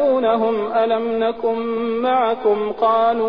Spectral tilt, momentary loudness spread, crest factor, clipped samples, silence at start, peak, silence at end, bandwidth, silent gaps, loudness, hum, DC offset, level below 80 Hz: -8 dB/octave; 5 LU; 12 dB; under 0.1%; 0 s; -6 dBFS; 0 s; 5.2 kHz; none; -19 LUFS; none; 0.5%; -56 dBFS